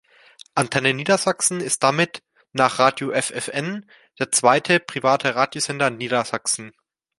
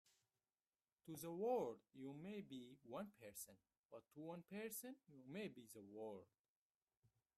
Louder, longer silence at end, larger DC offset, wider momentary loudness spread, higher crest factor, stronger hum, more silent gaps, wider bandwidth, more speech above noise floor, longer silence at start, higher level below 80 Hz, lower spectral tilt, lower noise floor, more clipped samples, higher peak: first, -20 LUFS vs -53 LUFS; first, 0.5 s vs 0.3 s; neither; second, 10 LU vs 16 LU; about the same, 20 dB vs 22 dB; neither; second, none vs 3.77-3.89 s, 6.39-6.87 s, 6.97-7.02 s; second, 12 kHz vs 14.5 kHz; second, 28 dB vs over 38 dB; second, 0.55 s vs 1.05 s; first, -66 dBFS vs under -90 dBFS; second, -3 dB/octave vs -5 dB/octave; second, -49 dBFS vs under -90 dBFS; neither; first, -2 dBFS vs -32 dBFS